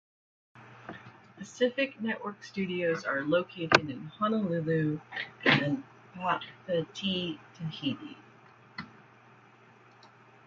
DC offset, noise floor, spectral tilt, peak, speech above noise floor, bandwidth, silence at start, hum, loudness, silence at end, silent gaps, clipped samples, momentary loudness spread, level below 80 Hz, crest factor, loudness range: under 0.1%; -58 dBFS; -5.5 dB/octave; -2 dBFS; 27 dB; 7.8 kHz; 0.55 s; none; -31 LUFS; 0.4 s; none; under 0.1%; 21 LU; -70 dBFS; 32 dB; 8 LU